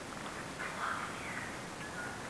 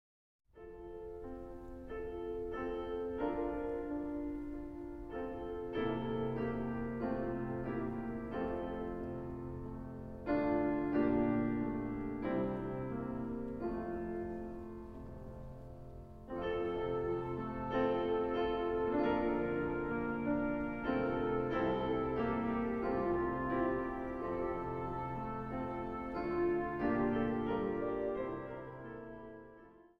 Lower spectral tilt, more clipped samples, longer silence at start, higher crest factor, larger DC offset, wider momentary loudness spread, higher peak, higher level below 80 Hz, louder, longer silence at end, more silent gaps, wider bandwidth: second, -3.5 dB/octave vs -9 dB/octave; neither; second, 0 s vs 0.55 s; about the same, 16 dB vs 16 dB; neither; second, 5 LU vs 14 LU; second, -26 dBFS vs -22 dBFS; second, -62 dBFS vs -54 dBFS; about the same, -40 LUFS vs -38 LUFS; second, 0 s vs 0.15 s; neither; first, 11 kHz vs 5.8 kHz